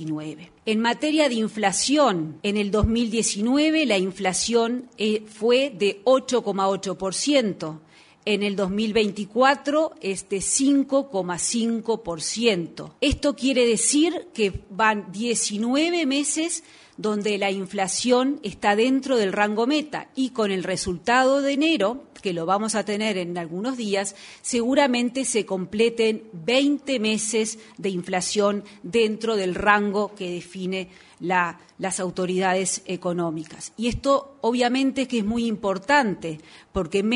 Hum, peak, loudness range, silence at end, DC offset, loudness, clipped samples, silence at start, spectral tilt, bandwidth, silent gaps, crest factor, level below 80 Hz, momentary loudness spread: none; -2 dBFS; 3 LU; 0 s; under 0.1%; -23 LUFS; under 0.1%; 0 s; -3.5 dB/octave; 11 kHz; none; 22 dB; -48 dBFS; 10 LU